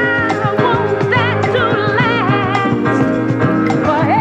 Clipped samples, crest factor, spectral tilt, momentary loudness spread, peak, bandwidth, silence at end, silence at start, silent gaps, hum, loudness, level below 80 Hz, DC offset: under 0.1%; 12 dB; -7 dB/octave; 2 LU; -2 dBFS; 9 kHz; 0 s; 0 s; none; none; -14 LUFS; -44 dBFS; under 0.1%